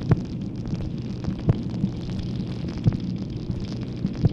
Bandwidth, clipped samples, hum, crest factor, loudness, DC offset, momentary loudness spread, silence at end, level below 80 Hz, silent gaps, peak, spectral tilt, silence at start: 7.4 kHz; under 0.1%; none; 18 dB; -28 LUFS; under 0.1%; 6 LU; 0 s; -38 dBFS; none; -8 dBFS; -8.5 dB/octave; 0 s